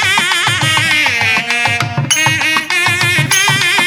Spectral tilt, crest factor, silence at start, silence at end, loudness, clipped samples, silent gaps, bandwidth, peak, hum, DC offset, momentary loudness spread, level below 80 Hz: -2 dB/octave; 12 dB; 0 s; 0 s; -11 LUFS; under 0.1%; none; 18 kHz; 0 dBFS; none; under 0.1%; 3 LU; -52 dBFS